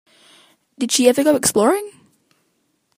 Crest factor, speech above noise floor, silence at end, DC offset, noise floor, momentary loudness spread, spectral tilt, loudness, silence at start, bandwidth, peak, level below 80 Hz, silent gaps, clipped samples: 20 dB; 51 dB; 1.1 s; under 0.1%; -67 dBFS; 12 LU; -3 dB/octave; -16 LUFS; 0.8 s; 15.5 kHz; 0 dBFS; -62 dBFS; none; under 0.1%